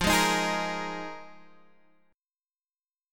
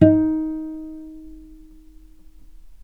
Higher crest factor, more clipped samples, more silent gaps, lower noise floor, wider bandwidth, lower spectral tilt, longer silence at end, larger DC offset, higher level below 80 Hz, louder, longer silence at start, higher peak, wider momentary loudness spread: about the same, 20 dB vs 22 dB; neither; neither; first, under -90 dBFS vs -45 dBFS; first, 17.5 kHz vs 3 kHz; second, -3 dB/octave vs -10.5 dB/octave; about the same, 0 s vs 0.1 s; neither; about the same, -50 dBFS vs -46 dBFS; second, -27 LUFS vs -22 LUFS; about the same, 0 s vs 0 s; second, -10 dBFS vs 0 dBFS; second, 18 LU vs 25 LU